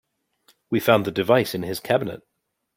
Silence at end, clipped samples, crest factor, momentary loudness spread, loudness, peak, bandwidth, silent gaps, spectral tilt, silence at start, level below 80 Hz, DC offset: 0.6 s; under 0.1%; 20 dB; 11 LU; -22 LUFS; -4 dBFS; 16.5 kHz; none; -5.5 dB/octave; 0.7 s; -62 dBFS; under 0.1%